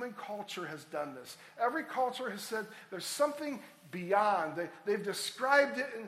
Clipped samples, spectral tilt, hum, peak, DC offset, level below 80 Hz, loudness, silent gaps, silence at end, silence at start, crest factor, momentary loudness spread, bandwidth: under 0.1%; -3 dB/octave; none; -14 dBFS; under 0.1%; -86 dBFS; -34 LUFS; none; 0 s; 0 s; 22 dB; 15 LU; 15.5 kHz